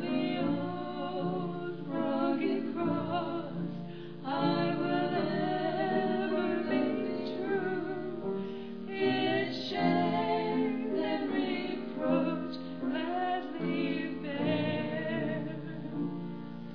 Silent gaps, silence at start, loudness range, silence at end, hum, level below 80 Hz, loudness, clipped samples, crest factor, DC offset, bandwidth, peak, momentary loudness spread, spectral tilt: none; 0 s; 3 LU; 0 s; none; -70 dBFS; -33 LUFS; under 0.1%; 16 dB; 0.4%; 5.4 kHz; -16 dBFS; 8 LU; -8.5 dB/octave